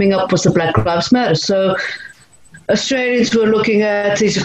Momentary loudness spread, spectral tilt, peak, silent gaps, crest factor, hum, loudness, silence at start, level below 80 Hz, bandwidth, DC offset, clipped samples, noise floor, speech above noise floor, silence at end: 6 LU; -5 dB/octave; 0 dBFS; none; 14 dB; none; -15 LUFS; 0 s; -44 dBFS; 8.8 kHz; under 0.1%; under 0.1%; -44 dBFS; 30 dB; 0 s